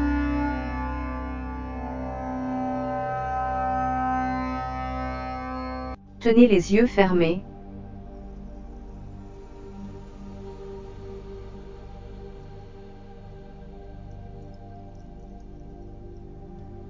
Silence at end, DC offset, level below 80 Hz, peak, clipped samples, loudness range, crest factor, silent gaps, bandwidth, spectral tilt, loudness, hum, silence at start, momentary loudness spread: 0 s; under 0.1%; -38 dBFS; -2 dBFS; under 0.1%; 21 LU; 26 dB; none; 7.6 kHz; -7 dB/octave; -25 LUFS; none; 0 s; 24 LU